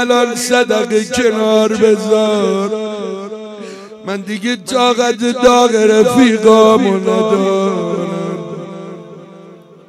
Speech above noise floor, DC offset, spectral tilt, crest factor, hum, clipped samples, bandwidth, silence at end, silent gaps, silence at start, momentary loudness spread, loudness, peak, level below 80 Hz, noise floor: 26 dB; under 0.1%; -4.5 dB/octave; 14 dB; none; 0.1%; 14 kHz; 0.35 s; none; 0 s; 18 LU; -12 LUFS; 0 dBFS; -50 dBFS; -38 dBFS